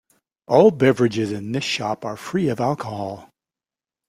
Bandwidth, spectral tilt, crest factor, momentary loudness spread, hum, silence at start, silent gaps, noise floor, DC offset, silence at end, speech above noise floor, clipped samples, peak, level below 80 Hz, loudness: 14.5 kHz; -6 dB/octave; 20 dB; 14 LU; none; 0.5 s; none; under -90 dBFS; under 0.1%; 0.85 s; over 70 dB; under 0.1%; -2 dBFS; -62 dBFS; -20 LUFS